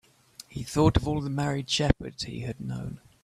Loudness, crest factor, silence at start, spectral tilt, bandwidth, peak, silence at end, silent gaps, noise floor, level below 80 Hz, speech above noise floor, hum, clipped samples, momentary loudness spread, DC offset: -28 LUFS; 24 dB; 0.5 s; -5.5 dB/octave; 14.5 kHz; -4 dBFS; 0.25 s; none; -52 dBFS; -42 dBFS; 25 dB; none; under 0.1%; 16 LU; under 0.1%